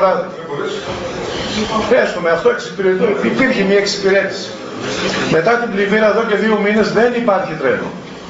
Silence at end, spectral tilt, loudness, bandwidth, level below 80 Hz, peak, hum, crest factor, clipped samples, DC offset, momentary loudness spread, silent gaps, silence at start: 0 s; -3.5 dB/octave; -15 LUFS; 8 kHz; -46 dBFS; -2 dBFS; none; 14 dB; under 0.1%; under 0.1%; 10 LU; none; 0 s